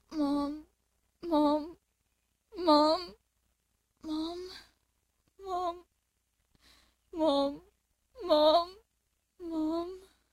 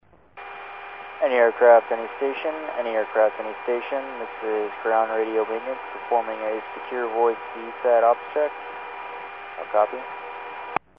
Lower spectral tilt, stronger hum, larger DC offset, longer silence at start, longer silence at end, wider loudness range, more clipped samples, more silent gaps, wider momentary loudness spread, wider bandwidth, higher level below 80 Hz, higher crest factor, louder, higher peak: first, -4.5 dB/octave vs -1 dB/octave; neither; neither; second, 0.1 s vs 0.35 s; first, 0.35 s vs 0.2 s; first, 10 LU vs 4 LU; neither; neither; first, 23 LU vs 16 LU; first, 13.5 kHz vs 5 kHz; about the same, -64 dBFS vs -68 dBFS; about the same, 20 dB vs 20 dB; second, -30 LUFS vs -23 LUFS; second, -14 dBFS vs -4 dBFS